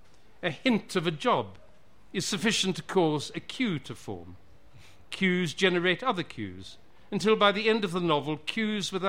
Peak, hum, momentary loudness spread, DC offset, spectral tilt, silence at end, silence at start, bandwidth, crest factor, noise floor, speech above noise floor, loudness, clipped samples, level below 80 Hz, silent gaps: -10 dBFS; none; 16 LU; 0.4%; -4.5 dB/octave; 0 s; 0.4 s; 16 kHz; 20 dB; -60 dBFS; 31 dB; -28 LUFS; under 0.1%; -62 dBFS; none